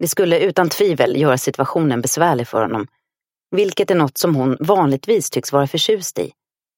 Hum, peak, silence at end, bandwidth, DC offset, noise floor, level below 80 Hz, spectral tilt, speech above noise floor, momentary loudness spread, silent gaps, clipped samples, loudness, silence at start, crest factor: none; 0 dBFS; 0.5 s; 17 kHz; under 0.1%; -86 dBFS; -62 dBFS; -4.5 dB/octave; 69 dB; 7 LU; none; under 0.1%; -17 LUFS; 0 s; 16 dB